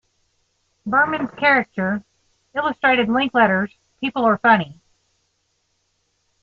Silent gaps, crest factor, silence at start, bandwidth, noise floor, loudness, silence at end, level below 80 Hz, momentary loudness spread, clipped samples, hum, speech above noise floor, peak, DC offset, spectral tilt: none; 20 dB; 0.85 s; 7.2 kHz; -69 dBFS; -19 LUFS; 1.7 s; -62 dBFS; 12 LU; under 0.1%; none; 51 dB; -2 dBFS; under 0.1%; -7 dB/octave